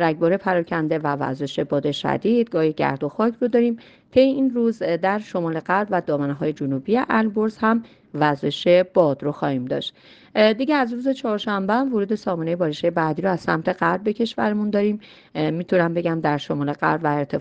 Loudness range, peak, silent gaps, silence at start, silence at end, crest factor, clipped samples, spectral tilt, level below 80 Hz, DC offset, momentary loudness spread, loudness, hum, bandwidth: 2 LU; -4 dBFS; none; 0 s; 0 s; 18 dB; under 0.1%; -7.5 dB/octave; -60 dBFS; under 0.1%; 7 LU; -21 LUFS; none; 8.2 kHz